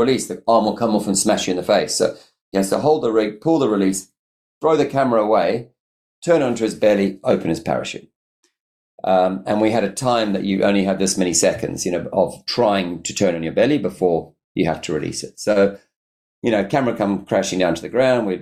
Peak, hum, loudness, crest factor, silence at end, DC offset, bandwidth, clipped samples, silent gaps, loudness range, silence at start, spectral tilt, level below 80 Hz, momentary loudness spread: -4 dBFS; none; -19 LUFS; 14 dB; 0 s; under 0.1%; 14.5 kHz; under 0.1%; 2.41-2.52 s, 4.19-4.61 s, 5.80-6.22 s, 8.16-8.43 s, 8.60-8.98 s, 14.44-14.55 s, 15.96-16.42 s; 3 LU; 0 s; -4.5 dB/octave; -54 dBFS; 7 LU